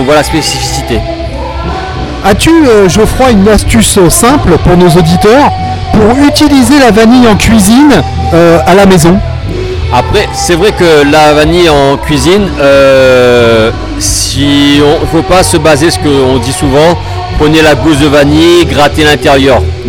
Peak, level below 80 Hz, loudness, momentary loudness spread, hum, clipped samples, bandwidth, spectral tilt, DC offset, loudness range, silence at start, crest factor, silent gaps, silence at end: 0 dBFS; -20 dBFS; -5 LUFS; 8 LU; none; 8%; 18.5 kHz; -5 dB/octave; under 0.1%; 2 LU; 0 s; 4 dB; none; 0 s